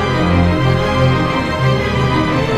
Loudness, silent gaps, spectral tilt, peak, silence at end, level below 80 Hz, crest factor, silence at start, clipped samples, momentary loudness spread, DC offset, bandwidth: -14 LUFS; none; -7 dB/octave; -2 dBFS; 0 s; -28 dBFS; 12 dB; 0 s; under 0.1%; 2 LU; under 0.1%; 10.5 kHz